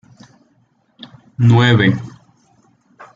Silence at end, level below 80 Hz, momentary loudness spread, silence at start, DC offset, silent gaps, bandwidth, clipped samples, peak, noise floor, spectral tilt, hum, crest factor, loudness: 1.05 s; -50 dBFS; 24 LU; 1.4 s; under 0.1%; none; 7.4 kHz; under 0.1%; -2 dBFS; -59 dBFS; -7.5 dB/octave; none; 16 dB; -13 LUFS